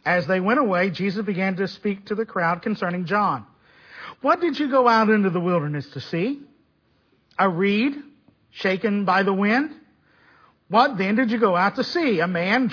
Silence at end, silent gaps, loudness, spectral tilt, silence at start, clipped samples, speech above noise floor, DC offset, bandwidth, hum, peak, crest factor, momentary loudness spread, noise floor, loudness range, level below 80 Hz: 0 s; none; -22 LUFS; -7 dB/octave; 0.05 s; under 0.1%; 43 dB; under 0.1%; 5.4 kHz; none; -4 dBFS; 18 dB; 9 LU; -64 dBFS; 4 LU; -68 dBFS